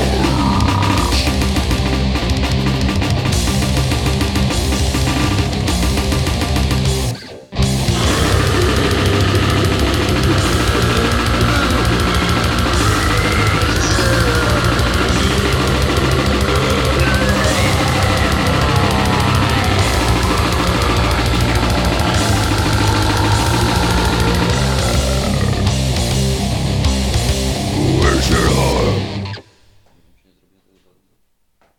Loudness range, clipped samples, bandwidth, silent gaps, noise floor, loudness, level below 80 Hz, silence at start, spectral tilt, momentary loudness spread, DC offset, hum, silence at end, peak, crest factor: 2 LU; under 0.1%; 17.5 kHz; none; -60 dBFS; -15 LUFS; -22 dBFS; 0 s; -5 dB/octave; 3 LU; 0.2%; none; 2.35 s; 0 dBFS; 14 dB